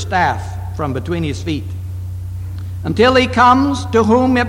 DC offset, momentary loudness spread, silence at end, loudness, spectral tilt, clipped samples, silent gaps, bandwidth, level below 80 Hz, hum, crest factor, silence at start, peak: under 0.1%; 16 LU; 0 s; -15 LUFS; -6 dB/octave; under 0.1%; none; 16 kHz; -36 dBFS; none; 14 dB; 0 s; 0 dBFS